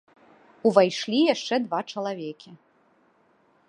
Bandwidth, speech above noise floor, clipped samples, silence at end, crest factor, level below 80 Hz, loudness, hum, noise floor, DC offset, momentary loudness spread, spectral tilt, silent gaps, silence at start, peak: 10.5 kHz; 39 dB; under 0.1%; 1.15 s; 24 dB; -82 dBFS; -24 LUFS; none; -63 dBFS; under 0.1%; 15 LU; -5 dB/octave; none; 0.65 s; -2 dBFS